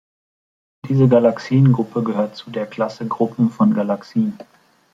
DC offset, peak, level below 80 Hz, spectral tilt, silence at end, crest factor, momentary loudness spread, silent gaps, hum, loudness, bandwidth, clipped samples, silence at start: under 0.1%; -2 dBFS; -60 dBFS; -9 dB/octave; 0.55 s; 16 dB; 10 LU; none; none; -18 LUFS; 7.6 kHz; under 0.1%; 0.85 s